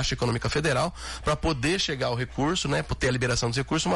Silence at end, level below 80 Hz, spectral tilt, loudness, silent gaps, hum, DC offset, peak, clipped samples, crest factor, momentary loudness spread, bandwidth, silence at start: 0 s; -40 dBFS; -4.5 dB/octave; -26 LUFS; none; none; under 0.1%; -14 dBFS; under 0.1%; 12 dB; 3 LU; 11.5 kHz; 0 s